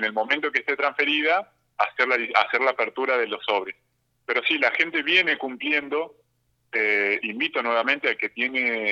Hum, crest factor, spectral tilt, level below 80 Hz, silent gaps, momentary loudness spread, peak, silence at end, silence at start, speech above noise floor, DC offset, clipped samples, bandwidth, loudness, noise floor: none; 20 dB; -3.5 dB/octave; -78 dBFS; none; 7 LU; -4 dBFS; 0 s; 0 s; 46 dB; under 0.1%; under 0.1%; 8 kHz; -23 LUFS; -70 dBFS